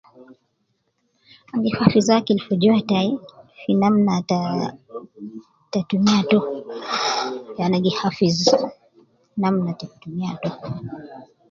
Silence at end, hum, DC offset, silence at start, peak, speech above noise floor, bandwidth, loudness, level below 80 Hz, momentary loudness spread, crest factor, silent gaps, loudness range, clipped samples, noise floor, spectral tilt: 0.25 s; none; under 0.1%; 0.2 s; 0 dBFS; 50 dB; 7.8 kHz; -21 LUFS; -58 dBFS; 16 LU; 22 dB; none; 4 LU; under 0.1%; -70 dBFS; -6 dB/octave